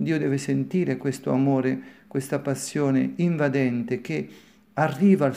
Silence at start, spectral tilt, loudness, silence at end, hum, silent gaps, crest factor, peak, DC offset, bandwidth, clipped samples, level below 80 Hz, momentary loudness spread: 0 s; -7 dB/octave; -25 LUFS; 0 s; none; none; 16 dB; -8 dBFS; under 0.1%; 15.5 kHz; under 0.1%; -70 dBFS; 10 LU